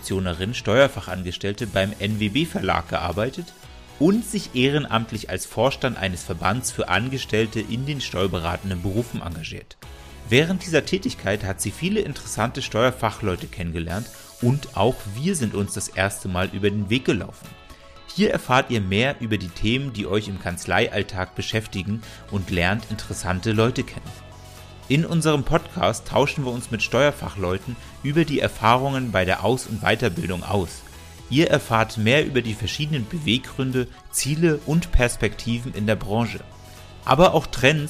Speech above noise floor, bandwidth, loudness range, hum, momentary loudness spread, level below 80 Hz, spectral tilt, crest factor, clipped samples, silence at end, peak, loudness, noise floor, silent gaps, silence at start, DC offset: 21 dB; 15.5 kHz; 3 LU; none; 12 LU; -38 dBFS; -5 dB/octave; 20 dB; under 0.1%; 0 s; -2 dBFS; -23 LUFS; -43 dBFS; none; 0 s; under 0.1%